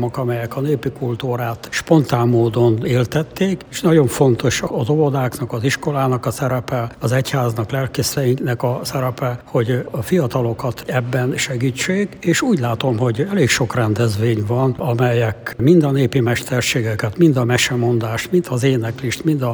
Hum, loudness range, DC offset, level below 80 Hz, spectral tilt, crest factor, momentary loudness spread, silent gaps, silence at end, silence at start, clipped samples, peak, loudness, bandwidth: none; 3 LU; under 0.1%; -48 dBFS; -6 dB/octave; 16 dB; 7 LU; none; 0 s; 0 s; under 0.1%; 0 dBFS; -18 LUFS; over 20 kHz